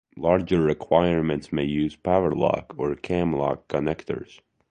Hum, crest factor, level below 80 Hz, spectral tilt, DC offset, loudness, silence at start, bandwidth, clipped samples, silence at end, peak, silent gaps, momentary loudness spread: none; 20 dB; -46 dBFS; -8 dB/octave; under 0.1%; -24 LUFS; 0.15 s; 9.6 kHz; under 0.1%; 0.45 s; -4 dBFS; none; 8 LU